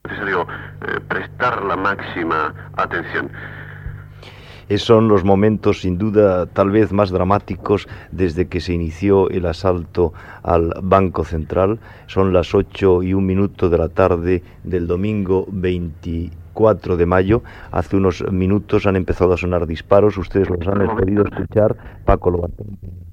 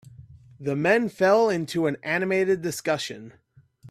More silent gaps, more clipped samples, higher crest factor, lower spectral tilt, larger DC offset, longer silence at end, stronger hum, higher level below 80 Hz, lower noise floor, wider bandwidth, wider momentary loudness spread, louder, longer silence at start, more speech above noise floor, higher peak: neither; neither; about the same, 18 dB vs 18 dB; first, -8 dB/octave vs -5 dB/octave; neither; about the same, 0 s vs 0 s; neither; first, -34 dBFS vs -64 dBFS; second, -38 dBFS vs -48 dBFS; second, 8.2 kHz vs 14.5 kHz; about the same, 11 LU vs 11 LU; first, -18 LUFS vs -24 LUFS; about the same, 0.05 s vs 0.05 s; about the same, 21 dB vs 24 dB; first, 0 dBFS vs -6 dBFS